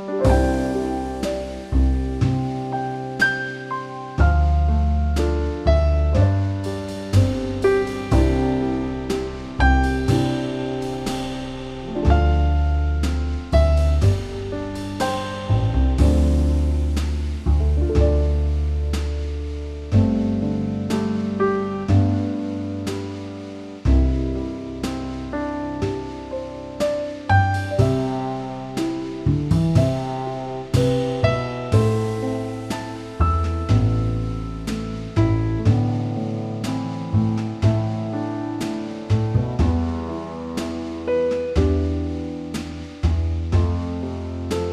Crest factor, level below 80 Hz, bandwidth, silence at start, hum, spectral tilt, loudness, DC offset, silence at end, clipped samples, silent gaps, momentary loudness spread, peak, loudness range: 16 dB; -26 dBFS; 11.5 kHz; 0 s; none; -7.5 dB/octave; -22 LUFS; under 0.1%; 0 s; under 0.1%; none; 10 LU; -4 dBFS; 4 LU